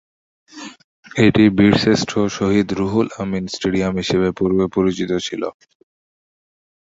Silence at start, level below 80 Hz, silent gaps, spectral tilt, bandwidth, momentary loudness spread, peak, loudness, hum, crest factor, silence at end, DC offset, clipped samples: 0.55 s; -44 dBFS; 0.84-1.03 s; -6 dB/octave; 8 kHz; 15 LU; 0 dBFS; -18 LUFS; none; 18 dB; 1.3 s; under 0.1%; under 0.1%